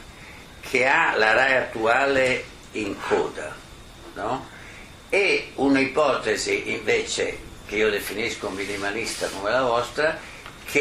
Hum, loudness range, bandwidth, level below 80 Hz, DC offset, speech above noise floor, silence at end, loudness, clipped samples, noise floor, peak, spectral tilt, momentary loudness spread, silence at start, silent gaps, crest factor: none; 5 LU; 15.5 kHz; -50 dBFS; under 0.1%; 20 dB; 0 s; -23 LUFS; under 0.1%; -43 dBFS; -4 dBFS; -3.5 dB/octave; 20 LU; 0 s; none; 20 dB